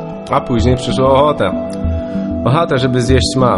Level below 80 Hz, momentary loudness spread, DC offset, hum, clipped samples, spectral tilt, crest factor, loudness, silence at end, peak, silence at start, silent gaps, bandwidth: -26 dBFS; 8 LU; under 0.1%; none; under 0.1%; -6 dB/octave; 14 dB; -14 LUFS; 0 s; 0 dBFS; 0 s; none; 11.5 kHz